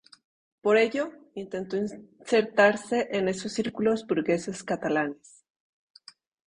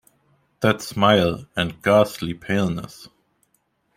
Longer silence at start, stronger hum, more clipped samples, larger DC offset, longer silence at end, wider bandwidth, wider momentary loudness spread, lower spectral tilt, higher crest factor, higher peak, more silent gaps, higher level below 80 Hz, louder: about the same, 0.65 s vs 0.6 s; neither; neither; neither; first, 1.35 s vs 0.9 s; second, 10.5 kHz vs 16 kHz; about the same, 13 LU vs 11 LU; about the same, -5 dB/octave vs -5.5 dB/octave; about the same, 20 dB vs 20 dB; second, -8 dBFS vs -2 dBFS; neither; second, -68 dBFS vs -52 dBFS; second, -27 LUFS vs -21 LUFS